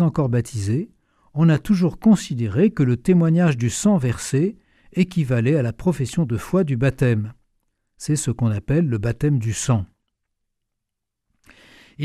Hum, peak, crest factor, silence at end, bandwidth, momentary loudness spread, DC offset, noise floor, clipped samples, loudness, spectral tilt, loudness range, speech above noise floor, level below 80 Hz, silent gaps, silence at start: none; -4 dBFS; 16 dB; 0 s; 14 kHz; 7 LU; under 0.1%; -80 dBFS; under 0.1%; -20 LUFS; -7 dB/octave; 5 LU; 61 dB; -46 dBFS; none; 0 s